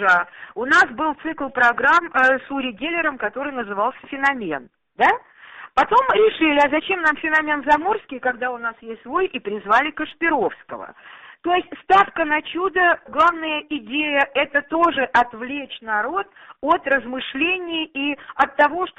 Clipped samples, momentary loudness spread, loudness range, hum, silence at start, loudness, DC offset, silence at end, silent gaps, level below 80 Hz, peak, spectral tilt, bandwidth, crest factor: under 0.1%; 12 LU; 4 LU; none; 0 s; -20 LUFS; under 0.1%; 0.1 s; none; -56 dBFS; -4 dBFS; -4 dB/octave; 8.4 kHz; 16 dB